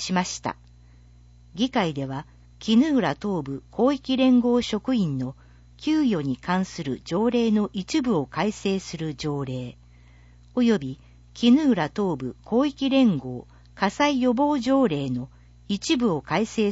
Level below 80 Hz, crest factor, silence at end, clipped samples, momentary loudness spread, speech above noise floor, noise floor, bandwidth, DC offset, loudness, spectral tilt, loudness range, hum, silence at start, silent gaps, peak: -52 dBFS; 18 dB; 0 s; under 0.1%; 13 LU; 28 dB; -51 dBFS; 8 kHz; under 0.1%; -24 LUFS; -5.5 dB/octave; 3 LU; 60 Hz at -45 dBFS; 0 s; none; -8 dBFS